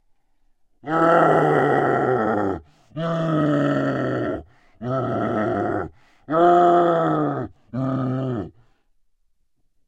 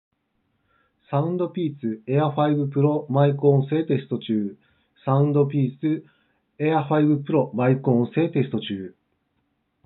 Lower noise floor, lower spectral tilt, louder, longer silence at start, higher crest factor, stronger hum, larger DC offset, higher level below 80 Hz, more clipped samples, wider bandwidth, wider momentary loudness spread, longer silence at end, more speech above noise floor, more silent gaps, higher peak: second, -63 dBFS vs -72 dBFS; about the same, -8.5 dB/octave vs -8 dB/octave; about the same, -21 LUFS vs -23 LUFS; second, 0.85 s vs 1.1 s; about the same, 18 dB vs 18 dB; neither; neither; first, -54 dBFS vs -78 dBFS; neither; first, 8.8 kHz vs 4.1 kHz; first, 15 LU vs 9 LU; first, 1.35 s vs 0.95 s; second, 46 dB vs 50 dB; neither; about the same, -4 dBFS vs -6 dBFS